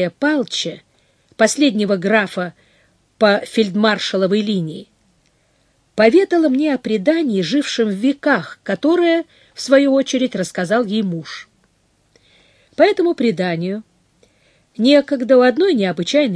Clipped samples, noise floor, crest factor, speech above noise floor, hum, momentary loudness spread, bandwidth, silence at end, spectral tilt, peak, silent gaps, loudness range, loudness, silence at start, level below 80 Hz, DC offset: under 0.1%; -60 dBFS; 18 dB; 44 dB; none; 13 LU; 11 kHz; 0 s; -5 dB/octave; 0 dBFS; none; 4 LU; -16 LUFS; 0 s; -64 dBFS; under 0.1%